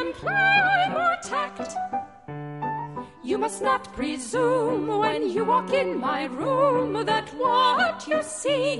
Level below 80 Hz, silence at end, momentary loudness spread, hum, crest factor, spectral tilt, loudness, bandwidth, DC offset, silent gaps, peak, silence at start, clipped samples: -58 dBFS; 0 s; 12 LU; none; 16 dB; -4 dB/octave; -24 LUFS; 11.5 kHz; under 0.1%; none; -8 dBFS; 0 s; under 0.1%